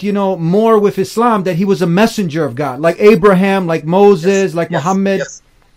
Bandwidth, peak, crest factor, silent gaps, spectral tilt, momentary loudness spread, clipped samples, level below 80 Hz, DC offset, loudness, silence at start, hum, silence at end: 15.5 kHz; 0 dBFS; 12 dB; none; -6.5 dB/octave; 8 LU; 0.3%; -48 dBFS; under 0.1%; -12 LUFS; 0 s; none; 0.4 s